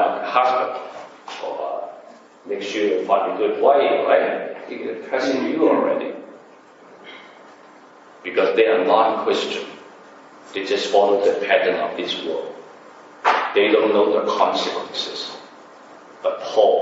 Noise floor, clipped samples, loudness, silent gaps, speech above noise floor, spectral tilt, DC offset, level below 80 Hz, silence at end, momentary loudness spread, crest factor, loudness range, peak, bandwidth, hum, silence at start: -46 dBFS; under 0.1%; -20 LUFS; none; 28 dB; -4 dB/octave; under 0.1%; -78 dBFS; 0 s; 18 LU; 20 dB; 4 LU; -2 dBFS; 8 kHz; none; 0 s